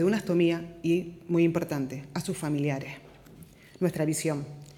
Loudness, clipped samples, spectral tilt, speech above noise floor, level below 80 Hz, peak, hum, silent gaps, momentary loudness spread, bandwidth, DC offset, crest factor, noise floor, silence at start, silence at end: -29 LUFS; under 0.1%; -6 dB/octave; 23 dB; -62 dBFS; -12 dBFS; none; none; 10 LU; 16.5 kHz; under 0.1%; 16 dB; -51 dBFS; 0 s; 0.05 s